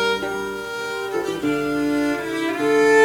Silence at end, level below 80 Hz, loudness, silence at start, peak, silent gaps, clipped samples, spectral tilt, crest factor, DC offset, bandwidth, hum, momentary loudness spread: 0 s; -52 dBFS; -22 LUFS; 0 s; -4 dBFS; none; under 0.1%; -4 dB/octave; 16 dB; under 0.1%; 18 kHz; none; 9 LU